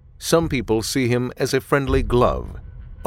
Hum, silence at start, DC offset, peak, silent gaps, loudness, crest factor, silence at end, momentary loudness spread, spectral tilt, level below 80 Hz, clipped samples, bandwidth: none; 0.2 s; under 0.1%; -4 dBFS; none; -20 LUFS; 18 dB; 0 s; 13 LU; -5.5 dB/octave; -32 dBFS; under 0.1%; 17 kHz